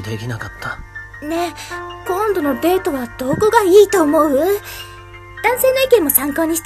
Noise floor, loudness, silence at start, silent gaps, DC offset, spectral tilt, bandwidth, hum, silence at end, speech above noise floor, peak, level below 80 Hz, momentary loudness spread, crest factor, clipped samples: -35 dBFS; -15 LUFS; 0 s; none; under 0.1%; -4 dB/octave; 14.5 kHz; none; 0 s; 20 dB; 0 dBFS; -42 dBFS; 19 LU; 16 dB; under 0.1%